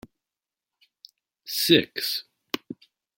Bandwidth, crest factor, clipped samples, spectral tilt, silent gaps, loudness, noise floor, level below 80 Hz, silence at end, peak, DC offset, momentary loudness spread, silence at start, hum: 17 kHz; 26 dB; under 0.1%; -3.5 dB/octave; none; -24 LUFS; -90 dBFS; -68 dBFS; 0.45 s; -4 dBFS; under 0.1%; 24 LU; 1.45 s; none